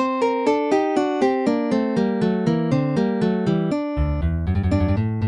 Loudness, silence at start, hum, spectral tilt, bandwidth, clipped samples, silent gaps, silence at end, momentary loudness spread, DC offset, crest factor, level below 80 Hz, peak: -21 LUFS; 0 s; none; -8 dB/octave; 10.5 kHz; under 0.1%; none; 0 s; 3 LU; under 0.1%; 14 dB; -34 dBFS; -6 dBFS